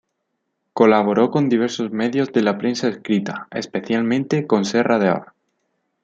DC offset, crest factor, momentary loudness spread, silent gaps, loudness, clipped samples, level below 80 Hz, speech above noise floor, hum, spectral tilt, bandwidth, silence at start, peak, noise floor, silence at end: under 0.1%; 18 dB; 10 LU; none; -19 LUFS; under 0.1%; -66 dBFS; 56 dB; none; -6 dB/octave; 7.8 kHz; 0.75 s; 0 dBFS; -74 dBFS; 0.8 s